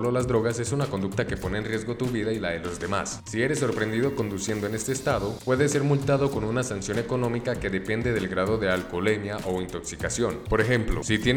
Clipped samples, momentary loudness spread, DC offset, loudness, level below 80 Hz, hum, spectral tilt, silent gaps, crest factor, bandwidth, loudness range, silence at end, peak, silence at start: under 0.1%; 6 LU; under 0.1%; -27 LUFS; -42 dBFS; none; -5 dB/octave; none; 18 dB; over 20 kHz; 2 LU; 0 s; -8 dBFS; 0 s